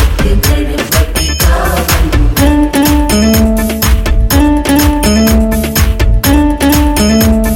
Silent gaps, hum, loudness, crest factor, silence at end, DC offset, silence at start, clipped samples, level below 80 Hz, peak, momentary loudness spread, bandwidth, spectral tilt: none; none; -10 LUFS; 8 dB; 0 s; under 0.1%; 0 s; under 0.1%; -12 dBFS; 0 dBFS; 3 LU; 17.5 kHz; -5 dB/octave